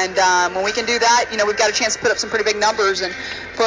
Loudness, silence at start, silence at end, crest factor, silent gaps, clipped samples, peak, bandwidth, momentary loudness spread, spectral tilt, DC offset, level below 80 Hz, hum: -17 LUFS; 0 s; 0 s; 16 dB; none; under 0.1%; -2 dBFS; 7.8 kHz; 7 LU; -1 dB/octave; under 0.1%; -50 dBFS; none